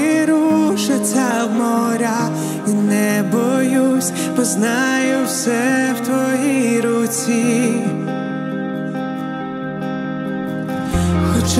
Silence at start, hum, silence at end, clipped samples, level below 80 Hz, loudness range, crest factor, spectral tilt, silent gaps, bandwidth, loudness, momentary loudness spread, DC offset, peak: 0 s; none; 0 s; under 0.1%; -40 dBFS; 5 LU; 14 dB; -5 dB/octave; none; 16 kHz; -18 LUFS; 8 LU; under 0.1%; -2 dBFS